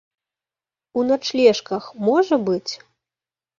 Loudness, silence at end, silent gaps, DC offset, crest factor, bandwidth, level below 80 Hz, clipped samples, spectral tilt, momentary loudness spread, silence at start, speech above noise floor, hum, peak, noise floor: -20 LUFS; 0.85 s; none; under 0.1%; 20 dB; 7.4 kHz; -66 dBFS; under 0.1%; -5 dB/octave; 12 LU; 0.95 s; over 71 dB; none; -2 dBFS; under -90 dBFS